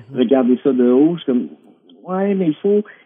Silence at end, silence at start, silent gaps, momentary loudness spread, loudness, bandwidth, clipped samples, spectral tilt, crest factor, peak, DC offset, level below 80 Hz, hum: 0.15 s; 0.1 s; none; 8 LU; -16 LUFS; 3.7 kHz; under 0.1%; -11.5 dB/octave; 14 dB; -2 dBFS; under 0.1%; -78 dBFS; none